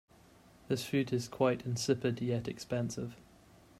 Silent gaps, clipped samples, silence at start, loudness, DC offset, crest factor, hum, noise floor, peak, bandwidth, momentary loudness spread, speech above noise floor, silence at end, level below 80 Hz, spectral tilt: none; under 0.1%; 0.7 s; -35 LUFS; under 0.1%; 20 dB; none; -61 dBFS; -16 dBFS; 15.5 kHz; 7 LU; 27 dB; 0.6 s; -66 dBFS; -5.5 dB/octave